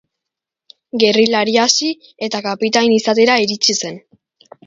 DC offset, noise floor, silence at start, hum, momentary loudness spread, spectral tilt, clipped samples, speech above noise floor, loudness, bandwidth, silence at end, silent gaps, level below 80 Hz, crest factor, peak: under 0.1%; -83 dBFS; 0.95 s; none; 10 LU; -2.5 dB/octave; under 0.1%; 68 dB; -14 LUFS; 7.8 kHz; 0.7 s; none; -64 dBFS; 16 dB; 0 dBFS